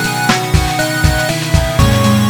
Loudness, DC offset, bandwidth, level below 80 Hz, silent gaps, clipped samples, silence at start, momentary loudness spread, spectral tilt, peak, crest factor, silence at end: -13 LUFS; under 0.1%; 19.5 kHz; -20 dBFS; none; under 0.1%; 0 s; 3 LU; -4.5 dB/octave; 0 dBFS; 12 dB; 0 s